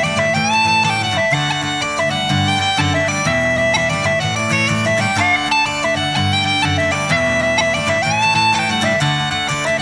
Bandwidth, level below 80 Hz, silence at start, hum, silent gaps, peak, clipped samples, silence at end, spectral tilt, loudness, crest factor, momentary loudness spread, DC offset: 11 kHz; -44 dBFS; 0 s; none; none; -2 dBFS; under 0.1%; 0 s; -3.5 dB/octave; -15 LUFS; 14 dB; 4 LU; under 0.1%